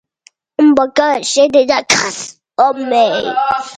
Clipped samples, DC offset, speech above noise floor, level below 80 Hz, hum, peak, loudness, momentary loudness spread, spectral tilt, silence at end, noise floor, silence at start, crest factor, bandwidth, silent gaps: under 0.1%; under 0.1%; 38 dB; -54 dBFS; none; 0 dBFS; -13 LUFS; 10 LU; -2.5 dB/octave; 0 s; -51 dBFS; 0.6 s; 14 dB; 10.5 kHz; none